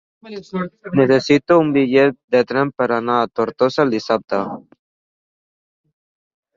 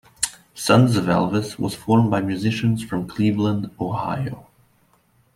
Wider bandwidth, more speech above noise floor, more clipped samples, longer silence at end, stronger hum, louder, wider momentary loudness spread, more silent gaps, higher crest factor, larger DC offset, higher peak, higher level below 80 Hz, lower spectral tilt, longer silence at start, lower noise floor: second, 7.6 kHz vs 15 kHz; first, over 73 dB vs 40 dB; neither; first, 1.95 s vs 0.95 s; neither; first, -17 LUFS vs -21 LUFS; about the same, 13 LU vs 11 LU; first, 2.24-2.28 s vs none; about the same, 18 dB vs 18 dB; neither; about the same, -2 dBFS vs -2 dBFS; second, -60 dBFS vs -54 dBFS; about the same, -6.5 dB/octave vs -6 dB/octave; about the same, 0.25 s vs 0.2 s; first, under -90 dBFS vs -60 dBFS